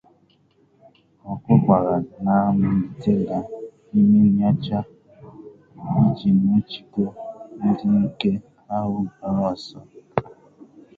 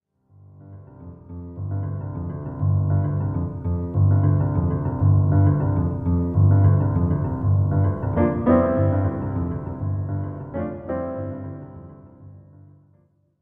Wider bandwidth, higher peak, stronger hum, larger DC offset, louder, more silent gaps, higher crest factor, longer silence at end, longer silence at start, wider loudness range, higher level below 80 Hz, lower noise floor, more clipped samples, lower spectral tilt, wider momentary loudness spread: first, 4.9 kHz vs 2.4 kHz; about the same, -2 dBFS vs -4 dBFS; neither; second, under 0.1% vs 0.2%; about the same, -21 LUFS vs -22 LUFS; neither; about the same, 20 dB vs 16 dB; second, 0.75 s vs 1 s; first, 1.25 s vs 0.6 s; second, 5 LU vs 10 LU; second, -52 dBFS vs -40 dBFS; about the same, -60 dBFS vs -60 dBFS; neither; second, -10 dB/octave vs -13.5 dB/octave; about the same, 17 LU vs 15 LU